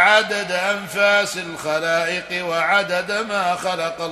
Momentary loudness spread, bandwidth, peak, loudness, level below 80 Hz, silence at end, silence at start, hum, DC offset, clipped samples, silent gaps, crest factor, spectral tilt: 7 LU; 13.5 kHz; -2 dBFS; -20 LUFS; -60 dBFS; 0 s; 0 s; none; under 0.1%; under 0.1%; none; 18 dB; -2.5 dB/octave